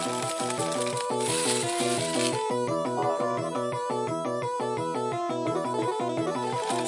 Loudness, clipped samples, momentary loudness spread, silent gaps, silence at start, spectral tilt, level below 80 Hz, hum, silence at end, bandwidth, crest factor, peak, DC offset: -28 LUFS; under 0.1%; 4 LU; none; 0 s; -3.5 dB/octave; -74 dBFS; none; 0 s; 11.5 kHz; 16 dB; -12 dBFS; under 0.1%